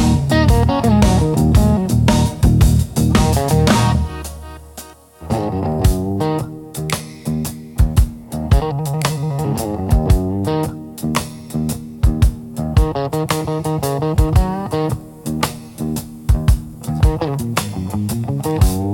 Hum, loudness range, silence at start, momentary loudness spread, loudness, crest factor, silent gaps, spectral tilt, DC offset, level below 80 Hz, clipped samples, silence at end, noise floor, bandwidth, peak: none; 6 LU; 0 s; 11 LU; -18 LUFS; 16 dB; none; -6.5 dB/octave; under 0.1%; -22 dBFS; under 0.1%; 0 s; -38 dBFS; 17 kHz; 0 dBFS